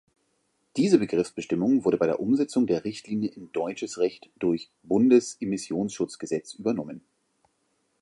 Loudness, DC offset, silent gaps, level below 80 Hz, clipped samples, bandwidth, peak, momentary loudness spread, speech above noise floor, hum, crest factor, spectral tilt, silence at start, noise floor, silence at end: -26 LUFS; under 0.1%; none; -66 dBFS; under 0.1%; 11.5 kHz; -6 dBFS; 10 LU; 47 dB; none; 22 dB; -6 dB/octave; 0.75 s; -73 dBFS; 1 s